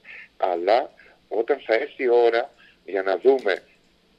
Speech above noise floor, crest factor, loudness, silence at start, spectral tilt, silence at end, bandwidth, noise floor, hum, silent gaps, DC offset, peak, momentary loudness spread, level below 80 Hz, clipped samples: 38 dB; 18 dB; -23 LUFS; 0.1 s; -4.5 dB/octave; 0.6 s; 7.4 kHz; -59 dBFS; none; none; under 0.1%; -4 dBFS; 11 LU; -72 dBFS; under 0.1%